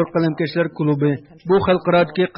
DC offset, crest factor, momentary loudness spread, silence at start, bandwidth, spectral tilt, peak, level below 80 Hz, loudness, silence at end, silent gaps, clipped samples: under 0.1%; 14 dB; 5 LU; 0 s; 5.6 kHz; -11.5 dB/octave; -6 dBFS; -52 dBFS; -19 LUFS; 0.1 s; none; under 0.1%